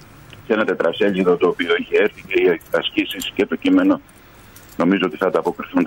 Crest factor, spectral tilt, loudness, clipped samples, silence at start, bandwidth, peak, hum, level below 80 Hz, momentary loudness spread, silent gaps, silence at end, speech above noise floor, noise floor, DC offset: 14 dB; -5.5 dB/octave; -19 LUFS; under 0.1%; 0.3 s; 16.5 kHz; -6 dBFS; none; -54 dBFS; 5 LU; none; 0 s; 26 dB; -44 dBFS; under 0.1%